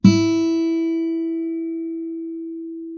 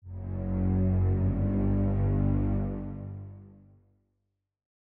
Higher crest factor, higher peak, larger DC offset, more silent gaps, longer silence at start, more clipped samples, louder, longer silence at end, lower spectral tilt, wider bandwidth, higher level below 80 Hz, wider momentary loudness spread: first, 20 dB vs 12 dB; first, 0 dBFS vs -16 dBFS; neither; neither; about the same, 0.05 s vs 0.05 s; neither; first, -22 LUFS vs -29 LUFS; second, 0 s vs 1.4 s; second, -7 dB/octave vs -12.5 dB/octave; first, 7 kHz vs 2.8 kHz; second, -54 dBFS vs -38 dBFS; about the same, 12 LU vs 13 LU